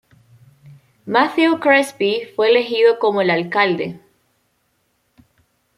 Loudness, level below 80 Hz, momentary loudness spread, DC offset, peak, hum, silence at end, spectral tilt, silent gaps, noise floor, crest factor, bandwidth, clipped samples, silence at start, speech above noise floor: -16 LUFS; -68 dBFS; 6 LU; under 0.1%; -2 dBFS; none; 1.8 s; -5 dB/octave; none; -66 dBFS; 16 dB; 13 kHz; under 0.1%; 0.65 s; 50 dB